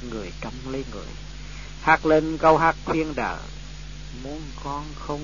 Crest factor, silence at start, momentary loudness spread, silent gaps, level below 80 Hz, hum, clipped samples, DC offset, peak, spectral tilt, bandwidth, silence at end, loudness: 22 dB; 0 s; 21 LU; none; -40 dBFS; 50 Hz at -40 dBFS; under 0.1%; 0.7%; -4 dBFS; -5.5 dB/octave; 7.4 kHz; 0 s; -23 LUFS